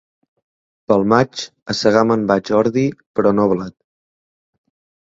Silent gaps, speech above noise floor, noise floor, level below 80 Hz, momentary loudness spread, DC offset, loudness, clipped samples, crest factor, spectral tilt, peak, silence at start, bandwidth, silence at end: 1.62-1.66 s, 3.06-3.14 s; over 74 dB; under -90 dBFS; -54 dBFS; 9 LU; under 0.1%; -17 LUFS; under 0.1%; 18 dB; -6 dB/octave; 0 dBFS; 0.9 s; 7.8 kHz; 1.35 s